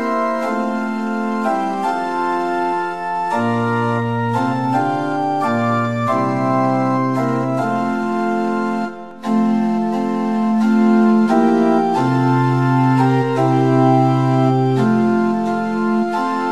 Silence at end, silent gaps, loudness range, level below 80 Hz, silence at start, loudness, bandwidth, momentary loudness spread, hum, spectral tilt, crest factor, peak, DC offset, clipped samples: 0 s; none; 4 LU; -64 dBFS; 0 s; -17 LUFS; 11 kHz; 6 LU; none; -8 dB/octave; 14 dB; -2 dBFS; 0.7%; under 0.1%